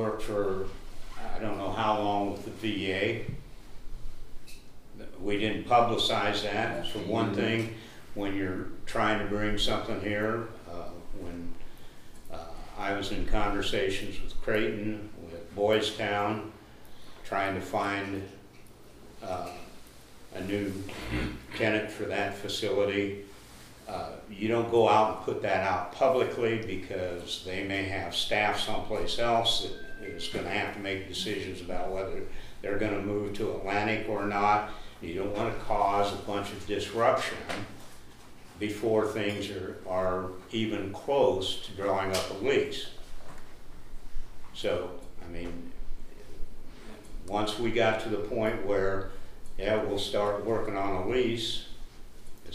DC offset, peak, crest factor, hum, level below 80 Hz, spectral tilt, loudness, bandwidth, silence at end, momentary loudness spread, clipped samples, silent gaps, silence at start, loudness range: under 0.1%; -10 dBFS; 20 dB; none; -42 dBFS; -5 dB/octave; -30 LUFS; 15 kHz; 0 s; 21 LU; under 0.1%; none; 0 s; 7 LU